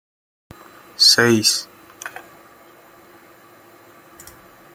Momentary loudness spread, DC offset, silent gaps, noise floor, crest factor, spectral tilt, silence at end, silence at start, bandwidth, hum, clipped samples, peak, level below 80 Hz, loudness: 28 LU; under 0.1%; none; -48 dBFS; 22 dB; -2 dB/octave; 2.65 s; 1 s; 17 kHz; none; under 0.1%; -2 dBFS; -62 dBFS; -14 LUFS